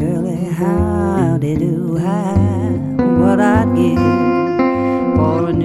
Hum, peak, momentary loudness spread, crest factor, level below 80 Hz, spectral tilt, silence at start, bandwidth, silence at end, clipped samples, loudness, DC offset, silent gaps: none; 0 dBFS; 6 LU; 14 dB; -34 dBFS; -8.5 dB/octave; 0 s; 12.5 kHz; 0 s; under 0.1%; -15 LUFS; 0.1%; none